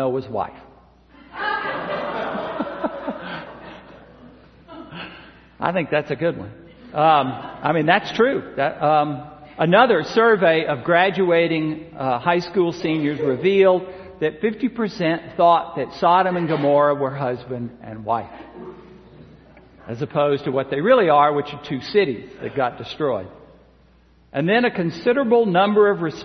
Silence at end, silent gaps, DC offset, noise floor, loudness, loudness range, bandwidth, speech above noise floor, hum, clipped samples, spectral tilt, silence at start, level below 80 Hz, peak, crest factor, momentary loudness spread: 0 s; none; under 0.1%; -54 dBFS; -20 LUFS; 10 LU; 6.4 kHz; 34 dB; none; under 0.1%; -7 dB/octave; 0 s; -56 dBFS; 0 dBFS; 20 dB; 17 LU